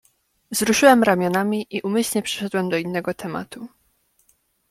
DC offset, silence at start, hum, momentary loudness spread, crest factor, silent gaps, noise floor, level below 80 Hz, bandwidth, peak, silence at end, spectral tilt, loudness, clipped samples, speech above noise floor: under 0.1%; 0.5 s; none; 17 LU; 20 dB; none; -65 dBFS; -60 dBFS; 16.5 kHz; -2 dBFS; 1.05 s; -4 dB/octave; -20 LUFS; under 0.1%; 44 dB